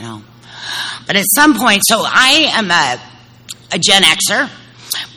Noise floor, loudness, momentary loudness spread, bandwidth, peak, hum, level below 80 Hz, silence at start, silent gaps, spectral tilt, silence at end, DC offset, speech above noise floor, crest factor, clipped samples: -35 dBFS; -11 LUFS; 17 LU; over 20 kHz; 0 dBFS; none; -52 dBFS; 0 s; none; -1.5 dB/octave; 0.1 s; under 0.1%; 23 dB; 14 dB; 0.4%